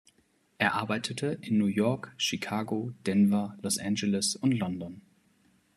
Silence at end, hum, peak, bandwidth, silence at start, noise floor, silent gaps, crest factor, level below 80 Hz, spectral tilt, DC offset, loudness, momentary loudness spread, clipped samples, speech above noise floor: 0.75 s; none; -8 dBFS; 13 kHz; 0.6 s; -68 dBFS; none; 22 dB; -72 dBFS; -4.5 dB/octave; under 0.1%; -29 LUFS; 7 LU; under 0.1%; 40 dB